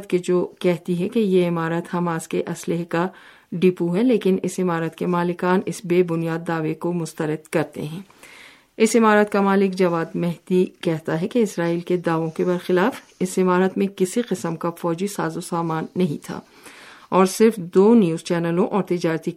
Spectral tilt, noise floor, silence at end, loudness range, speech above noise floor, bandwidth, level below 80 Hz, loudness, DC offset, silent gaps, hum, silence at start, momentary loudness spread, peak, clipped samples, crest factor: -6.5 dB/octave; -47 dBFS; 0 s; 4 LU; 26 dB; 15.5 kHz; -66 dBFS; -21 LUFS; under 0.1%; none; none; 0 s; 9 LU; -2 dBFS; under 0.1%; 18 dB